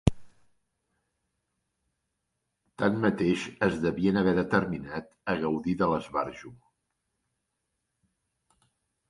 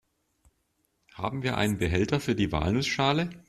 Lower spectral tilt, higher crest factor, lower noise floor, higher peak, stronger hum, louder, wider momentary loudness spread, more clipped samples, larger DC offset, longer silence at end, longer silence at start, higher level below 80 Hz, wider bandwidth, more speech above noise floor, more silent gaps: first, -7 dB/octave vs -5.5 dB/octave; first, 28 dB vs 20 dB; first, -82 dBFS vs -74 dBFS; first, -4 dBFS vs -10 dBFS; neither; about the same, -28 LUFS vs -27 LUFS; first, 10 LU vs 6 LU; neither; neither; first, 2.55 s vs 0.1 s; second, 0.05 s vs 1.15 s; about the same, -50 dBFS vs -48 dBFS; second, 11.5 kHz vs 14 kHz; first, 54 dB vs 47 dB; neither